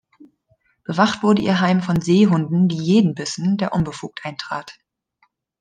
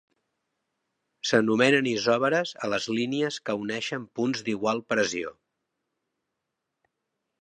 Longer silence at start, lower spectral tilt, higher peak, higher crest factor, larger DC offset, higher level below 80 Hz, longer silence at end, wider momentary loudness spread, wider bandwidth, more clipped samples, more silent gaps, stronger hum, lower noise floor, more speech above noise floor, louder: second, 0.9 s vs 1.25 s; first, -6.5 dB/octave vs -4 dB/octave; first, -2 dBFS vs -6 dBFS; about the same, 18 dB vs 22 dB; neither; first, -52 dBFS vs -72 dBFS; second, 0.9 s vs 2.1 s; first, 14 LU vs 10 LU; about the same, 9.4 kHz vs 10 kHz; neither; neither; neither; second, -65 dBFS vs -83 dBFS; second, 47 dB vs 57 dB; first, -19 LUFS vs -26 LUFS